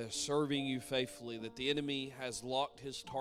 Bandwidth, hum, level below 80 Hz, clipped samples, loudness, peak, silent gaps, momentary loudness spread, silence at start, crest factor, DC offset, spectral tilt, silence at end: 16 kHz; none; -68 dBFS; under 0.1%; -38 LUFS; -22 dBFS; none; 8 LU; 0 s; 18 dB; under 0.1%; -3.5 dB/octave; 0 s